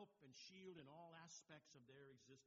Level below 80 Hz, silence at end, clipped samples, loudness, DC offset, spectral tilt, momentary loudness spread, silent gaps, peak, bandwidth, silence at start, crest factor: under -90 dBFS; 0 s; under 0.1%; -63 LUFS; under 0.1%; -3.5 dB/octave; 6 LU; none; -48 dBFS; 7.4 kHz; 0 s; 16 dB